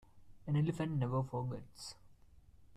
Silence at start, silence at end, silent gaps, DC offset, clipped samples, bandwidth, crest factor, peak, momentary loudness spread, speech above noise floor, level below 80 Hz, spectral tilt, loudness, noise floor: 0.15 s; 0 s; none; under 0.1%; under 0.1%; 13 kHz; 16 dB; -24 dBFS; 15 LU; 24 dB; -64 dBFS; -7.5 dB/octave; -38 LUFS; -61 dBFS